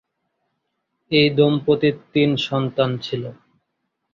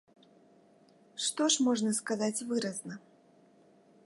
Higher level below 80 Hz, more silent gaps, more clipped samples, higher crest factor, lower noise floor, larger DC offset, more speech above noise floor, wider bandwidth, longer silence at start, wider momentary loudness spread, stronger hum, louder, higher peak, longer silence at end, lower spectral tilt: first, -58 dBFS vs -84 dBFS; neither; neither; about the same, 18 dB vs 20 dB; first, -75 dBFS vs -63 dBFS; neither; first, 57 dB vs 31 dB; second, 7.2 kHz vs 11.5 kHz; about the same, 1.1 s vs 1.15 s; second, 11 LU vs 19 LU; neither; first, -19 LUFS vs -31 LUFS; first, -2 dBFS vs -14 dBFS; second, 0.8 s vs 1.05 s; first, -7 dB/octave vs -3 dB/octave